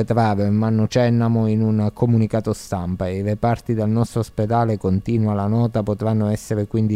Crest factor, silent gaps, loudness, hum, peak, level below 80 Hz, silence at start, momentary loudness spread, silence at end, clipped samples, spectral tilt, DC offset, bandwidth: 16 dB; none; -20 LUFS; none; -4 dBFS; -46 dBFS; 0 s; 5 LU; 0 s; under 0.1%; -8 dB/octave; under 0.1%; 12.5 kHz